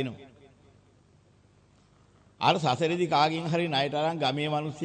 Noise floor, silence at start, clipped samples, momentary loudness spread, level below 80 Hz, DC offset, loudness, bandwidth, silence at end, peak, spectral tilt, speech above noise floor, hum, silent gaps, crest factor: -61 dBFS; 0 s; under 0.1%; 5 LU; -70 dBFS; under 0.1%; -27 LUFS; 9.4 kHz; 0 s; -8 dBFS; -5.5 dB/octave; 34 dB; 50 Hz at -60 dBFS; none; 22 dB